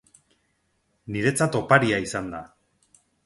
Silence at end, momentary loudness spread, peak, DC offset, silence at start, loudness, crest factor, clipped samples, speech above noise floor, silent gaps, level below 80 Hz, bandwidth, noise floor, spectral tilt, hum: 0.8 s; 15 LU; -2 dBFS; under 0.1%; 1.05 s; -23 LUFS; 26 dB; under 0.1%; 48 dB; none; -56 dBFS; 11.5 kHz; -71 dBFS; -5 dB/octave; none